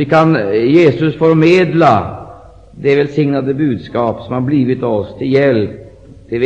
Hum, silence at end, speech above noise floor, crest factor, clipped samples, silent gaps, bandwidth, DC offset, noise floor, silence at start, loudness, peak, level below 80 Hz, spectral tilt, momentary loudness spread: none; 0 s; 25 dB; 12 dB; under 0.1%; none; 8.2 kHz; 0.2%; -36 dBFS; 0 s; -13 LUFS; 0 dBFS; -46 dBFS; -8 dB/octave; 9 LU